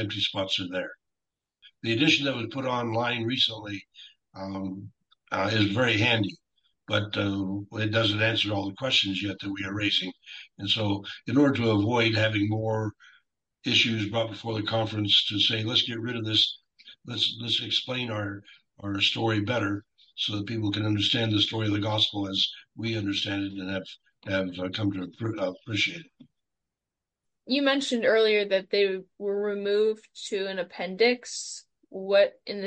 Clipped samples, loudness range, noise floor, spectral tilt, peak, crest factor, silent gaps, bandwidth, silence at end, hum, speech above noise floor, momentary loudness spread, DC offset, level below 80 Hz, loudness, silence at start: under 0.1%; 5 LU; -88 dBFS; -5 dB/octave; -10 dBFS; 18 dB; none; 9 kHz; 0 s; none; 61 dB; 13 LU; under 0.1%; -66 dBFS; -26 LUFS; 0 s